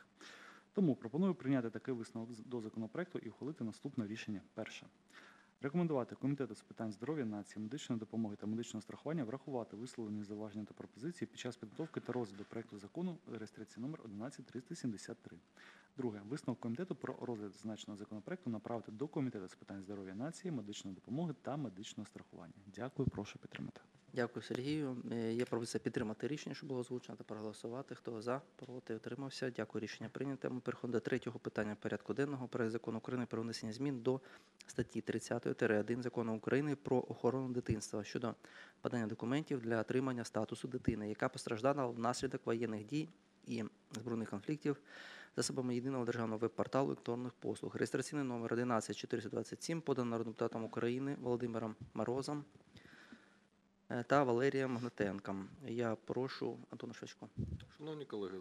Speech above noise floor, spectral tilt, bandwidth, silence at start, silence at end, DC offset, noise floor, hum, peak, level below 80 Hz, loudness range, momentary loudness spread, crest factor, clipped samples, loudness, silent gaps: 32 dB; -6 dB/octave; 13 kHz; 0 s; 0 s; under 0.1%; -73 dBFS; none; -16 dBFS; -70 dBFS; 7 LU; 12 LU; 24 dB; under 0.1%; -42 LUFS; none